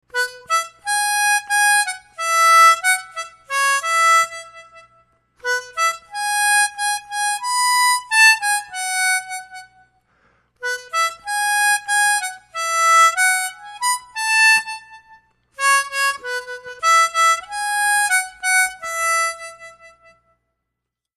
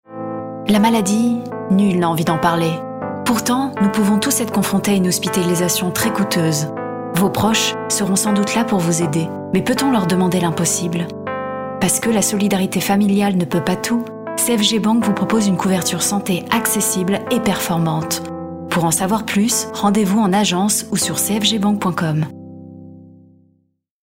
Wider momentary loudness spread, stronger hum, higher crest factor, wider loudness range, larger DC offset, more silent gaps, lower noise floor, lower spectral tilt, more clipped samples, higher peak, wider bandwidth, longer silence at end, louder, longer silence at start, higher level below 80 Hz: first, 14 LU vs 8 LU; neither; about the same, 16 dB vs 16 dB; first, 5 LU vs 2 LU; neither; neither; first, -81 dBFS vs -63 dBFS; second, 4 dB/octave vs -4 dB/octave; neither; about the same, -2 dBFS vs -2 dBFS; second, 14 kHz vs 16.5 kHz; first, 1.3 s vs 0.95 s; about the same, -17 LUFS vs -17 LUFS; about the same, 0.15 s vs 0.1 s; second, -66 dBFS vs -52 dBFS